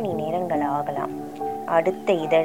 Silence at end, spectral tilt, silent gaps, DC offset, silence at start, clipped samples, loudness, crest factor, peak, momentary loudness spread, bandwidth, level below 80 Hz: 0 s; -6.5 dB/octave; none; 0.3%; 0 s; under 0.1%; -25 LUFS; 16 dB; -6 dBFS; 9 LU; 17 kHz; -66 dBFS